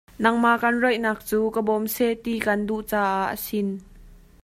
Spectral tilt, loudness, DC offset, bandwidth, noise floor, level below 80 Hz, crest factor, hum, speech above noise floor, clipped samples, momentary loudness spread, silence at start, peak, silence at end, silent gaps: -5 dB/octave; -23 LUFS; under 0.1%; 16 kHz; -48 dBFS; -52 dBFS; 20 dB; none; 25 dB; under 0.1%; 7 LU; 0.2 s; -4 dBFS; 0.25 s; none